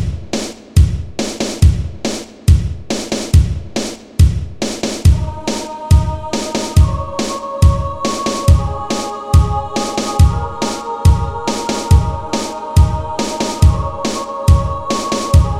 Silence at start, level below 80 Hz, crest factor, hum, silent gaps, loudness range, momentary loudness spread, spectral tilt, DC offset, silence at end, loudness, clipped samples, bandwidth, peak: 0 s; -18 dBFS; 14 dB; none; none; 1 LU; 8 LU; -5.5 dB/octave; 1%; 0 s; -16 LUFS; under 0.1%; 14 kHz; 0 dBFS